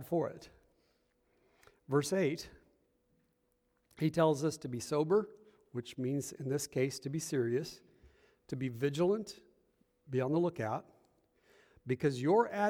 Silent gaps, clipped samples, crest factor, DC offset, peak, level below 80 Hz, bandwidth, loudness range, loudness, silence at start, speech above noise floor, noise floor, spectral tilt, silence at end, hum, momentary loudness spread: none; under 0.1%; 20 dB; under 0.1%; -16 dBFS; -72 dBFS; 19 kHz; 4 LU; -35 LUFS; 0 s; 44 dB; -77 dBFS; -6 dB/octave; 0 s; none; 15 LU